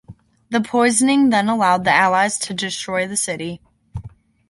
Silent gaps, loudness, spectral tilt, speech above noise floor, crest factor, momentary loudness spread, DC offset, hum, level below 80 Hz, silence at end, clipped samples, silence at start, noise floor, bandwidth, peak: none; -17 LUFS; -3.5 dB/octave; 22 dB; 18 dB; 21 LU; under 0.1%; none; -50 dBFS; 0.4 s; under 0.1%; 0.1 s; -40 dBFS; 11.5 kHz; -2 dBFS